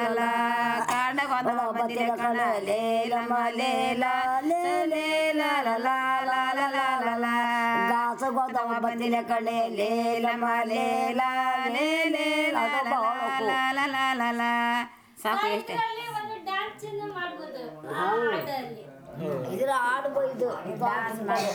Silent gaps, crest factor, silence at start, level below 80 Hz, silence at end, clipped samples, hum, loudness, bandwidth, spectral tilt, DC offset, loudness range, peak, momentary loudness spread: none; 14 dB; 0 s; -72 dBFS; 0 s; under 0.1%; none; -27 LUFS; over 20 kHz; -4 dB/octave; under 0.1%; 5 LU; -12 dBFS; 9 LU